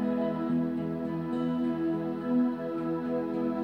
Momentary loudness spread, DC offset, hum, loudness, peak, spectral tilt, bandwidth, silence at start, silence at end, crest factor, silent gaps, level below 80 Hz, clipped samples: 5 LU; under 0.1%; none; -31 LUFS; -18 dBFS; -9.5 dB/octave; 5.2 kHz; 0 s; 0 s; 12 dB; none; -68 dBFS; under 0.1%